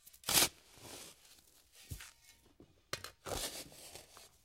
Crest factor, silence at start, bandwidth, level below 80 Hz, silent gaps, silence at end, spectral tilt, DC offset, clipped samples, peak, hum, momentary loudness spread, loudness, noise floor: 30 dB; 0.05 s; 16.5 kHz; -62 dBFS; none; 0.15 s; -1 dB/octave; under 0.1%; under 0.1%; -12 dBFS; none; 24 LU; -35 LUFS; -66 dBFS